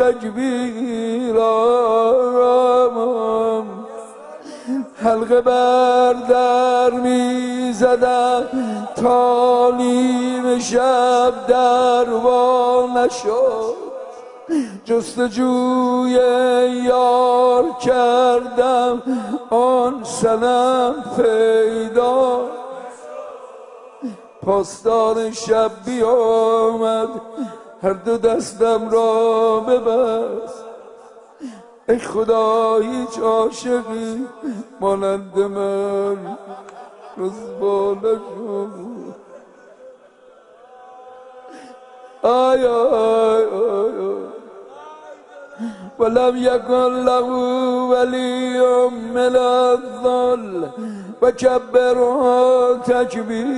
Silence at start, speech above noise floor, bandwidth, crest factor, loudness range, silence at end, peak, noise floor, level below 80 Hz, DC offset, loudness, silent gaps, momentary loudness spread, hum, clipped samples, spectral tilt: 0 s; 31 dB; 11 kHz; 16 dB; 7 LU; 0 s; -2 dBFS; -48 dBFS; -56 dBFS; under 0.1%; -17 LUFS; none; 16 LU; none; under 0.1%; -4.5 dB/octave